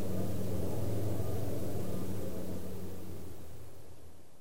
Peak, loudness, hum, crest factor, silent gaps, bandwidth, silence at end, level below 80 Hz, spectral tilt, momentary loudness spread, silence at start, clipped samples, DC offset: -22 dBFS; -39 LUFS; none; 12 dB; none; 16 kHz; 0 s; -54 dBFS; -7 dB/octave; 17 LU; 0 s; under 0.1%; 3%